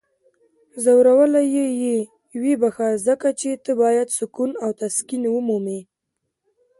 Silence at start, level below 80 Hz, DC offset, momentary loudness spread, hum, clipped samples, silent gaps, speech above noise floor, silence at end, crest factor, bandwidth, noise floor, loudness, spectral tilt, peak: 0.75 s; -70 dBFS; under 0.1%; 11 LU; none; under 0.1%; none; 59 dB; 1 s; 16 dB; 12 kHz; -78 dBFS; -20 LUFS; -5 dB/octave; -6 dBFS